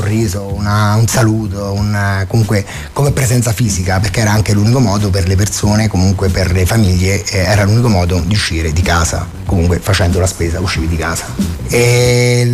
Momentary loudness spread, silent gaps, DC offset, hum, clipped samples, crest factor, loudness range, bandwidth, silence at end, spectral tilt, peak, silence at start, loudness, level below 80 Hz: 6 LU; none; under 0.1%; none; under 0.1%; 10 dB; 2 LU; 15.5 kHz; 0 s; -5 dB/octave; -2 dBFS; 0 s; -13 LUFS; -26 dBFS